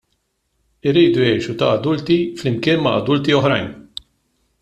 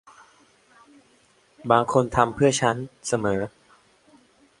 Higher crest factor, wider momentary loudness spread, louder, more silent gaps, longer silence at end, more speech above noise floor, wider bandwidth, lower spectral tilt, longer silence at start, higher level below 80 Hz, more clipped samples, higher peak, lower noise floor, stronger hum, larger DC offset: second, 16 dB vs 24 dB; first, 13 LU vs 10 LU; first, -17 LUFS vs -23 LUFS; neither; second, 0.8 s vs 1.1 s; first, 52 dB vs 38 dB; second, 9.6 kHz vs 11.5 kHz; first, -6.5 dB/octave vs -5 dB/octave; second, 0.85 s vs 1.65 s; about the same, -52 dBFS vs -52 dBFS; neither; about the same, -2 dBFS vs -2 dBFS; first, -69 dBFS vs -60 dBFS; neither; neither